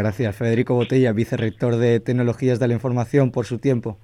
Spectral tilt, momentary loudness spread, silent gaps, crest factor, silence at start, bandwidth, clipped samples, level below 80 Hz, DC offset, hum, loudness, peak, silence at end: -8 dB/octave; 4 LU; none; 14 dB; 0 s; 11.5 kHz; under 0.1%; -54 dBFS; under 0.1%; none; -20 LUFS; -6 dBFS; 0.1 s